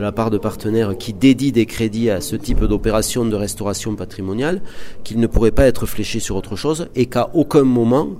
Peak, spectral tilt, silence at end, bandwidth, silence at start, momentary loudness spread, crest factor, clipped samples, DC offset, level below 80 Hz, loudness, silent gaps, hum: 0 dBFS; -6 dB/octave; 0 s; 16 kHz; 0 s; 10 LU; 16 dB; under 0.1%; under 0.1%; -28 dBFS; -18 LUFS; none; none